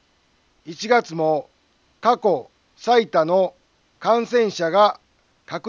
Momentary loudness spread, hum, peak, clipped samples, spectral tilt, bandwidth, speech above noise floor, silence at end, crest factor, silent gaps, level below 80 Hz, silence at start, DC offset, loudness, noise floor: 13 LU; none; -4 dBFS; under 0.1%; -5 dB/octave; 7.4 kHz; 43 dB; 0 s; 18 dB; none; -70 dBFS; 0.65 s; under 0.1%; -20 LUFS; -62 dBFS